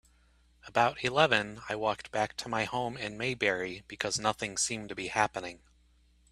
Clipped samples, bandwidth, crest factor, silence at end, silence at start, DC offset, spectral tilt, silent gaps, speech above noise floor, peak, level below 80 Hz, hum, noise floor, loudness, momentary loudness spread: under 0.1%; 14.5 kHz; 26 dB; 0.75 s; 0.65 s; under 0.1%; -3 dB/octave; none; 33 dB; -8 dBFS; -62 dBFS; none; -65 dBFS; -31 LUFS; 10 LU